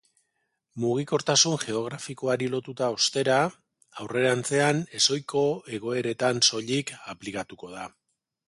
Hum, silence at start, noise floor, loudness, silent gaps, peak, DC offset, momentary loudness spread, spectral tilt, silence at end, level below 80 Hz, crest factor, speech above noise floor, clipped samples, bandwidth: none; 0.75 s; -77 dBFS; -25 LUFS; none; -8 dBFS; under 0.1%; 17 LU; -3 dB/octave; 0.6 s; -68 dBFS; 20 dB; 51 dB; under 0.1%; 11.5 kHz